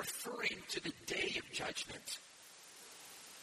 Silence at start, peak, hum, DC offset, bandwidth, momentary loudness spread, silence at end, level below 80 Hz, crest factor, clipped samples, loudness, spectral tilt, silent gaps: 0 s; -26 dBFS; none; under 0.1%; 15 kHz; 16 LU; 0 s; -74 dBFS; 20 dB; under 0.1%; -41 LUFS; -1.5 dB/octave; none